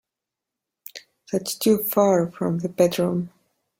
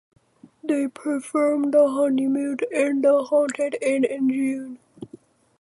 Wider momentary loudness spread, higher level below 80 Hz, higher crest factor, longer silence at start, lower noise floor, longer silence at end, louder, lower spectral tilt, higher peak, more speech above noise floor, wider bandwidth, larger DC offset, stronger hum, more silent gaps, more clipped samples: first, 21 LU vs 17 LU; first, -64 dBFS vs -76 dBFS; about the same, 20 dB vs 16 dB; first, 0.95 s vs 0.65 s; first, -86 dBFS vs -49 dBFS; about the same, 0.5 s vs 0.55 s; about the same, -22 LUFS vs -22 LUFS; about the same, -5.5 dB/octave vs -5 dB/octave; first, -4 dBFS vs -8 dBFS; first, 65 dB vs 28 dB; first, 16.5 kHz vs 11.5 kHz; neither; neither; neither; neither